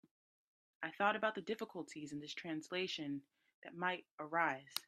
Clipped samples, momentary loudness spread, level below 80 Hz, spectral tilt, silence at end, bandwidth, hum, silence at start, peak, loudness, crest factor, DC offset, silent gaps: under 0.1%; 12 LU; -88 dBFS; -4 dB/octave; 0.05 s; 14 kHz; none; 0.8 s; -20 dBFS; -41 LUFS; 24 dB; under 0.1%; 3.54-3.62 s, 4.11-4.18 s